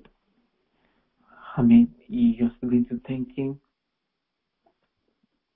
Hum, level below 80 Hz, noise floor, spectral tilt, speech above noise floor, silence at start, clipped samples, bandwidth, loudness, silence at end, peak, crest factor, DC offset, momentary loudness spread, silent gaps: none; -54 dBFS; -81 dBFS; -12 dB/octave; 59 dB; 1.45 s; under 0.1%; 3.7 kHz; -23 LUFS; 2 s; -8 dBFS; 18 dB; under 0.1%; 15 LU; none